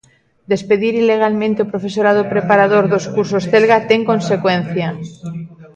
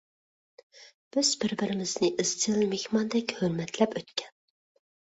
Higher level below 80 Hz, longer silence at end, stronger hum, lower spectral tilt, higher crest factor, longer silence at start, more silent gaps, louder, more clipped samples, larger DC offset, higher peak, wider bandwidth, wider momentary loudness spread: first, -56 dBFS vs -70 dBFS; second, 0.1 s vs 0.8 s; neither; first, -6 dB/octave vs -3.5 dB/octave; second, 14 dB vs 20 dB; second, 0.5 s vs 0.75 s; second, none vs 0.94-1.11 s; first, -15 LUFS vs -28 LUFS; neither; neither; first, 0 dBFS vs -10 dBFS; about the same, 8.6 kHz vs 8.4 kHz; first, 12 LU vs 7 LU